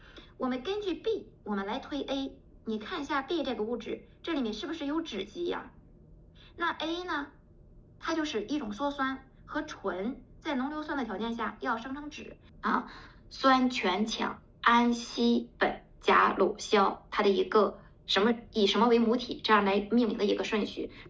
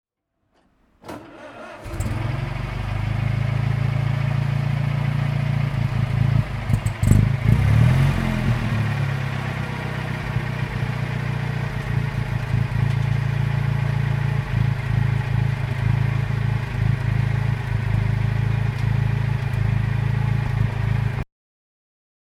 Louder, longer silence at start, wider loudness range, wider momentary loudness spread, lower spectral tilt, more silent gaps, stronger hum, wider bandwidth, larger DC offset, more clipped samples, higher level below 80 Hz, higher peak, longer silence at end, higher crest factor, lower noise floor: second, -30 LUFS vs -22 LUFS; second, 0 s vs 1.05 s; first, 9 LU vs 5 LU; first, 13 LU vs 8 LU; second, -4.5 dB/octave vs -7.5 dB/octave; neither; neither; second, 7.8 kHz vs 12.5 kHz; neither; neither; second, -58 dBFS vs -32 dBFS; second, -10 dBFS vs 0 dBFS; second, 0 s vs 1.15 s; about the same, 20 dB vs 20 dB; second, -55 dBFS vs -72 dBFS